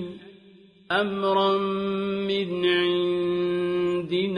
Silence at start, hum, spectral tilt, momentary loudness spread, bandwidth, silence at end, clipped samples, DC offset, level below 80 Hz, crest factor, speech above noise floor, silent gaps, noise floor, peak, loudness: 0 s; none; -7 dB/octave; 5 LU; 10 kHz; 0 s; under 0.1%; under 0.1%; -64 dBFS; 16 dB; 29 dB; none; -53 dBFS; -10 dBFS; -24 LUFS